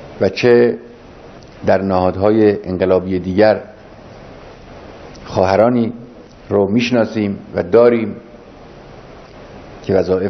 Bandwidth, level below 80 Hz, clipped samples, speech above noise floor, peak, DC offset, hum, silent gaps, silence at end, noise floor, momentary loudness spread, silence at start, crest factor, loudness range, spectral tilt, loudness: 6.4 kHz; -46 dBFS; under 0.1%; 24 dB; 0 dBFS; under 0.1%; none; none; 0 s; -38 dBFS; 24 LU; 0 s; 16 dB; 3 LU; -7.5 dB/octave; -15 LUFS